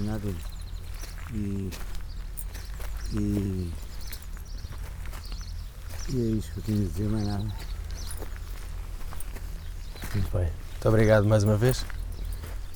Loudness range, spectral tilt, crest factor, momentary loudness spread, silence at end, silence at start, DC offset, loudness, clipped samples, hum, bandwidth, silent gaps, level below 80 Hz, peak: 9 LU; -6.5 dB/octave; 20 dB; 17 LU; 0 s; 0 s; under 0.1%; -31 LUFS; under 0.1%; none; 19.5 kHz; none; -36 dBFS; -10 dBFS